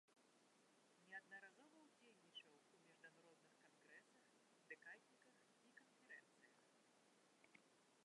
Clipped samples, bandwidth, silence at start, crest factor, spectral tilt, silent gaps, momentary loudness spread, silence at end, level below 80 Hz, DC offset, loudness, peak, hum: under 0.1%; 11 kHz; 0.05 s; 24 dB; -2 dB/octave; none; 9 LU; 0 s; under -90 dBFS; under 0.1%; -64 LUFS; -46 dBFS; none